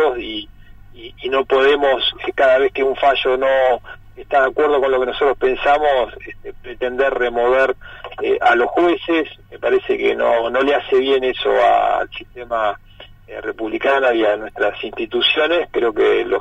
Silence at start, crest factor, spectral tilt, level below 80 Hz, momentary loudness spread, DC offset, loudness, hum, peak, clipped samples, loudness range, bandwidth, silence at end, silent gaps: 0 s; 14 dB; -5 dB/octave; -44 dBFS; 13 LU; under 0.1%; -17 LUFS; none; -2 dBFS; under 0.1%; 2 LU; 8 kHz; 0 s; none